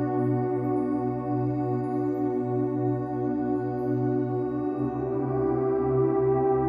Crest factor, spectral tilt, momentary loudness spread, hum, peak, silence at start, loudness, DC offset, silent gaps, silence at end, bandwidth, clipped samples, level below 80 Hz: 12 dB; -12 dB/octave; 5 LU; 60 Hz at -55 dBFS; -14 dBFS; 0 s; -27 LUFS; under 0.1%; none; 0 s; 2.8 kHz; under 0.1%; -54 dBFS